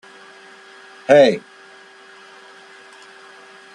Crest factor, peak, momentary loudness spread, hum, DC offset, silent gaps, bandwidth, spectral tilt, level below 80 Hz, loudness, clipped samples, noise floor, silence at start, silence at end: 20 dB; -2 dBFS; 29 LU; none; under 0.1%; none; 10.5 kHz; -5 dB/octave; -70 dBFS; -14 LUFS; under 0.1%; -44 dBFS; 1.1 s; 2.35 s